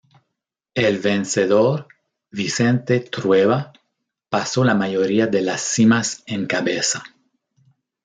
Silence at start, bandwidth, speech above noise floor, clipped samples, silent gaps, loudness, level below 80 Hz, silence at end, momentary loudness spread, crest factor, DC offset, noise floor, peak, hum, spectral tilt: 0.75 s; 9.6 kHz; 62 dB; under 0.1%; none; -19 LUFS; -64 dBFS; 0.95 s; 10 LU; 16 dB; under 0.1%; -80 dBFS; -4 dBFS; none; -4.5 dB/octave